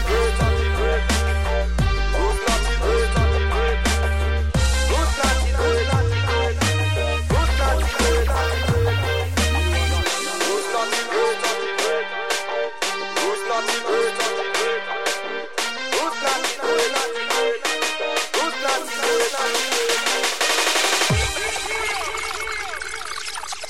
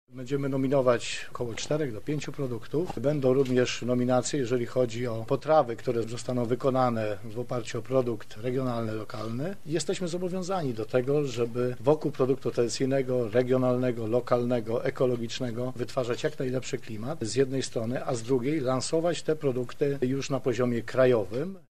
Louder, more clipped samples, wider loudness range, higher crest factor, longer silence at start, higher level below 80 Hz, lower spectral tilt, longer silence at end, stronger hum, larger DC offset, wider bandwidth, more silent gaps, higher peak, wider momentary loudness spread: first, -21 LUFS vs -28 LUFS; neither; about the same, 3 LU vs 4 LU; second, 14 dB vs 20 dB; about the same, 0 s vs 0.05 s; first, -26 dBFS vs -60 dBFS; second, -3.5 dB/octave vs -6 dB/octave; about the same, 0 s vs 0 s; neither; about the same, 1% vs 1%; first, 16 kHz vs 13.5 kHz; neither; about the same, -8 dBFS vs -8 dBFS; second, 5 LU vs 9 LU